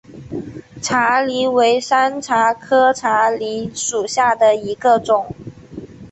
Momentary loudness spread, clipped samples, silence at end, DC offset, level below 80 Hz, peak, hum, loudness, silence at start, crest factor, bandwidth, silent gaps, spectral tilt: 17 LU; under 0.1%; 0.05 s; under 0.1%; -54 dBFS; -2 dBFS; none; -16 LUFS; 0.1 s; 14 dB; 8.4 kHz; none; -3 dB/octave